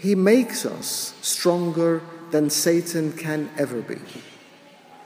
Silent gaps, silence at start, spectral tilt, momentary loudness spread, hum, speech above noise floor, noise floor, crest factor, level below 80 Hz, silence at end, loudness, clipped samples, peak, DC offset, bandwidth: none; 0 s; -4.5 dB/octave; 13 LU; none; 27 dB; -49 dBFS; 18 dB; -78 dBFS; 0 s; -22 LUFS; under 0.1%; -4 dBFS; under 0.1%; 16 kHz